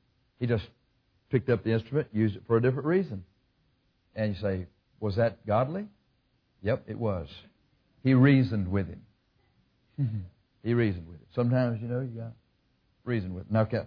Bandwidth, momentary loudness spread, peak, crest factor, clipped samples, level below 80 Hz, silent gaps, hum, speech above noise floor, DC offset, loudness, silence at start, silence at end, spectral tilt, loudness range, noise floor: 5.2 kHz; 16 LU; -8 dBFS; 20 dB; under 0.1%; -58 dBFS; none; none; 43 dB; under 0.1%; -29 LUFS; 0.4 s; 0 s; -10.5 dB/octave; 4 LU; -71 dBFS